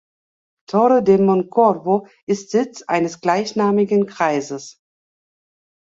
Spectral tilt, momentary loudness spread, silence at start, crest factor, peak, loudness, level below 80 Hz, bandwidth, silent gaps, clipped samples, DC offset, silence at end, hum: -6 dB/octave; 9 LU; 0.7 s; 18 dB; -2 dBFS; -18 LUFS; -64 dBFS; 7.8 kHz; 2.23-2.27 s; under 0.1%; under 0.1%; 1.15 s; none